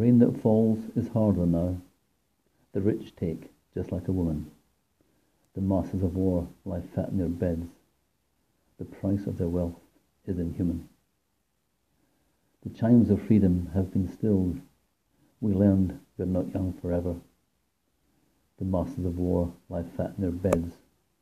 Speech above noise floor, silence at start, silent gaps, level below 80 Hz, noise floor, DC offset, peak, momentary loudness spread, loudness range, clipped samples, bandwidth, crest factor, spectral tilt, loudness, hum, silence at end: 49 dB; 0 s; none; -54 dBFS; -76 dBFS; under 0.1%; -4 dBFS; 14 LU; 7 LU; under 0.1%; 14.5 kHz; 24 dB; -10 dB/octave; -28 LUFS; none; 0.5 s